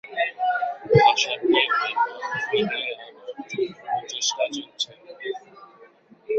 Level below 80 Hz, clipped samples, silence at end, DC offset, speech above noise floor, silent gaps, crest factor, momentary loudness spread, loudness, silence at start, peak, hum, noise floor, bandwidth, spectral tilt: -62 dBFS; under 0.1%; 0 s; under 0.1%; 28 dB; none; 22 dB; 16 LU; -23 LUFS; 0.05 s; -4 dBFS; none; -52 dBFS; 8.2 kHz; -3.5 dB/octave